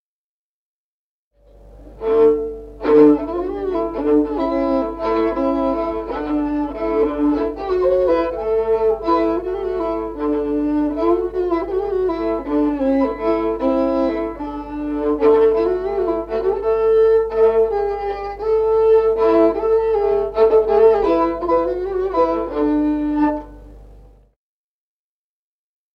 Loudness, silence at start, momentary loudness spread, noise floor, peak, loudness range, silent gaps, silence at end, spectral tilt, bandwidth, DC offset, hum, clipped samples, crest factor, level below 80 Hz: -18 LUFS; 1.65 s; 9 LU; under -90 dBFS; -2 dBFS; 4 LU; none; 1.95 s; -8 dB/octave; 5.6 kHz; under 0.1%; 50 Hz at -40 dBFS; under 0.1%; 16 dB; -40 dBFS